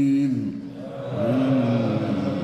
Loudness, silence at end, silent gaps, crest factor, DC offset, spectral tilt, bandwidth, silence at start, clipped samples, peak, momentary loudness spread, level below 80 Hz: -23 LUFS; 0 s; none; 12 dB; under 0.1%; -8.5 dB/octave; 8.4 kHz; 0 s; under 0.1%; -10 dBFS; 13 LU; -62 dBFS